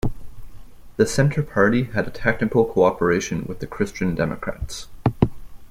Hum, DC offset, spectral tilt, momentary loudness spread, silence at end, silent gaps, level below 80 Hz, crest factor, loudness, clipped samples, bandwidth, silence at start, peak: none; under 0.1%; -6 dB/octave; 11 LU; 0.05 s; none; -38 dBFS; 18 dB; -22 LUFS; under 0.1%; 16 kHz; 0.05 s; -2 dBFS